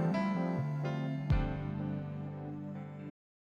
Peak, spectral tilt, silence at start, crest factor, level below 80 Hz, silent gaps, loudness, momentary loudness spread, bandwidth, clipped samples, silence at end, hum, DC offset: -20 dBFS; -9 dB/octave; 0 s; 16 dB; -46 dBFS; none; -37 LUFS; 11 LU; 7.2 kHz; under 0.1%; 0.45 s; none; under 0.1%